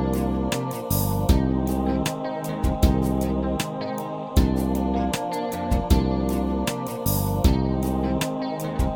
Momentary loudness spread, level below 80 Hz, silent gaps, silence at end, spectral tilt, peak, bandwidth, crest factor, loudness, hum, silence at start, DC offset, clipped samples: 6 LU; -28 dBFS; none; 0 s; -6 dB/octave; -6 dBFS; 19 kHz; 18 dB; -24 LUFS; none; 0 s; under 0.1%; under 0.1%